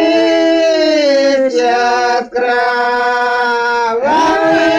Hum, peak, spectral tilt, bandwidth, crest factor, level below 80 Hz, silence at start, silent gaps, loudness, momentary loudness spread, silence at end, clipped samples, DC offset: none; -2 dBFS; -3 dB/octave; 10 kHz; 10 dB; -50 dBFS; 0 s; none; -12 LUFS; 3 LU; 0 s; under 0.1%; under 0.1%